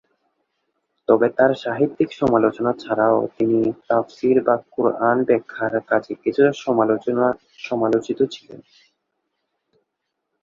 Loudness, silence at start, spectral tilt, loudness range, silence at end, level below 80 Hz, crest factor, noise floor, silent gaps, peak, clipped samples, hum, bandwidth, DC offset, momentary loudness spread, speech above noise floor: -20 LUFS; 1.1 s; -7 dB/octave; 4 LU; 1.8 s; -60 dBFS; 18 dB; -78 dBFS; none; -2 dBFS; under 0.1%; none; 7.6 kHz; under 0.1%; 6 LU; 59 dB